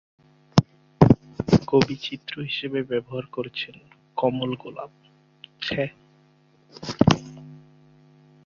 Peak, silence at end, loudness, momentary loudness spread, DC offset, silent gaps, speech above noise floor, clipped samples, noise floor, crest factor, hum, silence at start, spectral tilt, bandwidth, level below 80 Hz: -2 dBFS; 0.9 s; -24 LUFS; 19 LU; under 0.1%; none; 32 dB; under 0.1%; -59 dBFS; 24 dB; none; 0.55 s; -6.5 dB/octave; 7.6 kHz; -48 dBFS